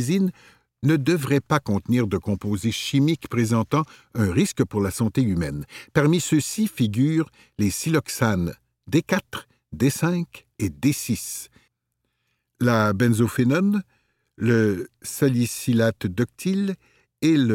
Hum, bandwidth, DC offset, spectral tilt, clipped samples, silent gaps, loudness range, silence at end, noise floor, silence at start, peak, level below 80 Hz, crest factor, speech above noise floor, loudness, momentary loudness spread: none; 17 kHz; under 0.1%; -6 dB/octave; under 0.1%; none; 3 LU; 0 s; -76 dBFS; 0 s; -4 dBFS; -52 dBFS; 18 dB; 55 dB; -23 LUFS; 10 LU